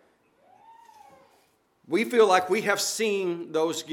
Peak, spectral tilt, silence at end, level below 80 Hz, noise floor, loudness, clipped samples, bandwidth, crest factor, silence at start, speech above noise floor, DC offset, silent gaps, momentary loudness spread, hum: -6 dBFS; -3 dB/octave; 0 s; -82 dBFS; -65 dBFS; -24 LUFS; under 0.1%; 17.5 kHz; 20 dB; 1.9 s; 41 dB; under 0.1%; none; 9 LU; none